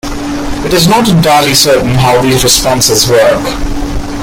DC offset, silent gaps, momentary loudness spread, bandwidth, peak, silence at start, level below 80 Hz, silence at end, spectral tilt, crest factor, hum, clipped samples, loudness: under 0.1%; none; 11 LU; over 20 kHz; 0 dBFS; 0.05 s; -22 dBFS; 0 s; -3.5 dB/octave; 8 dB; none; 0.3%; -8 LUFS